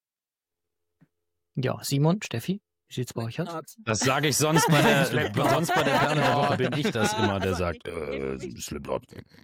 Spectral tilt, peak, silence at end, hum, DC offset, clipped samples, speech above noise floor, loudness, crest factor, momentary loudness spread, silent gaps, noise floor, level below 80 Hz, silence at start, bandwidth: -4.5 dB/octave; -10 dBFS; 0.2 s; none; under 0.1%; under 0.1%; over 65 dB; -25 LUFS; 16 dB; 13 LU; none; under -90 dBFS; -54 dBFS; 1.55 s; 17 kHz